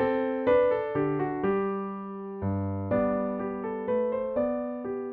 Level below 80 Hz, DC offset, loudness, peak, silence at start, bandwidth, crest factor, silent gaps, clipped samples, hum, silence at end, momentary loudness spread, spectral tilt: -58 dBFS; under 0.1%; -29 LUFS; -12 dBFS; 0 s; 4.3 kHz; 16 dB; none; under 0.1%; none; 0 s; 10 LU; -7.5 dB/octave